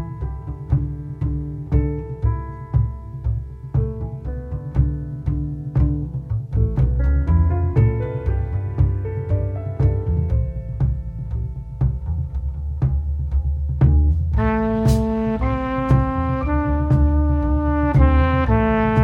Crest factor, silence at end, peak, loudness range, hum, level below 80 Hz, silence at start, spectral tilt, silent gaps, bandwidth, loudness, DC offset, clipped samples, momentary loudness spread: 18 dB; 0 s; -2 dBFS; 6 LU; none; -24 dBFS; 0 s; -9.5 dB/octave; none; 6.6 kHz; -21 LUFS; under 0.1%; under 0.1%; 10 LU